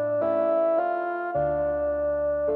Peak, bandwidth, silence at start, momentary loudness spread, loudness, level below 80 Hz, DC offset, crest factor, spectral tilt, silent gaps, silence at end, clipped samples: -14 dBFS; 4.2 kHz; 0 s; 4 LU; -25 LUFS; -50 dBFS; under 0.1%; 10 dB; -10 dB/octave; none; 0 s; under 0.1%